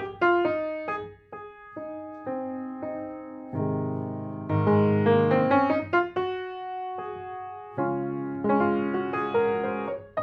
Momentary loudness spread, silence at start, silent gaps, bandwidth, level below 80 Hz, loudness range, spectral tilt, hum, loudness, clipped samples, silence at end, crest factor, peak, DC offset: 16 LU; 0 s; none; 6 kHz; -64 dBFS; 9 LU; -9.5 dB/octave; none; -27 LUFS; under 0.1%; 0 s; 18 dB; -10 dBFS; under 0.1%